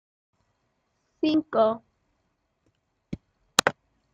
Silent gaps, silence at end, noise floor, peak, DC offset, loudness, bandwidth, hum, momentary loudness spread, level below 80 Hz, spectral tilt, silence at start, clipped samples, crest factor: none; 0.45 s; -75 dBFS; 0 dBFS; under 0.1%; -25 LUFS; 15.5 kHz; none; 18 LU; -64 dBFS; -3 dB/octave; 1.25 s; under 0.1%; 30 dB